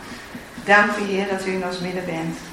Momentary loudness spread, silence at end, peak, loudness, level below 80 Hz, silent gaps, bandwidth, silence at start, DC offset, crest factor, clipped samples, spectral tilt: 19 LU; 0 s; -2 dBFS; -21 LUFS; -52 dBFS; none; 16 kHz; 0 s; under 0.1%; 22 dB; under 0.1%; -4.5 dB/octave